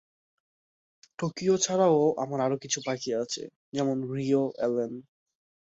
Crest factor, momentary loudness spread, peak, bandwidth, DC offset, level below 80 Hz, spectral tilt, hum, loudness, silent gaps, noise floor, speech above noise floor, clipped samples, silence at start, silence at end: 18 dB; 12 LU; -10 dBFS; 8 kHz; under 0.1%; -72 dBFS; -4.5 dB/octave; none; -28 LUFS; 3.56-3.72 s; under -90 dBFS; over 63 dB; under 0.1%; 1.2 s; 0.75 s